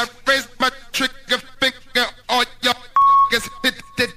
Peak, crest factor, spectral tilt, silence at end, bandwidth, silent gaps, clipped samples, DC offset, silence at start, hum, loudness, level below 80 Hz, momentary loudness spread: -2 dBFS; 18 dB; -1.5 dB/octave; 0.05 s; 15.5 kHz; none; under 0.1%; under 0.1%; 0 s; none; -18 LUFS; -46 dBFS; 8 LU